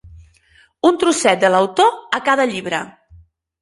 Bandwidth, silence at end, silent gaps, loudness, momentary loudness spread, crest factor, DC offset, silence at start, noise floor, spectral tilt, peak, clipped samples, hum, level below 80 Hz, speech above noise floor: 11.5 kHz; 0.7 s; none; -16 LUFS; 10 LU; 18 dB; under 0.1%; 0.05 s; -54 dBFS; -3.5 dB/octave; 0 dBFS; under 0.1%; none; -52 dBFS; 38 dB